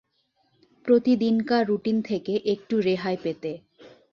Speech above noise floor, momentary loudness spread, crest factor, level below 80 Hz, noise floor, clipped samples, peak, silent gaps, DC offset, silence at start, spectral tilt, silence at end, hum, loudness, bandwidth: 47 dB; 13 LU; 16 dB; -68 dBFS; -70 dBFS; under 0.1%; -8 dBFS; none; under 0.1%; 0.85 s; -7.5 dB/octave; 0.25 s; none; -24 LUFS; 6.8 kHz